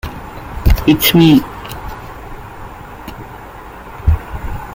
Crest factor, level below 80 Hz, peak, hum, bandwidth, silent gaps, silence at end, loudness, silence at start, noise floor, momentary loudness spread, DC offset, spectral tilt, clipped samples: 16 dB; -22 dBFS; 0 dBFS; none; 17 kHz; none; 0 s; -13 LUFS; 0.05 s; -32 dBFS; 23 LU; under 0.1%; -5.5 dB/octave; under 0.1%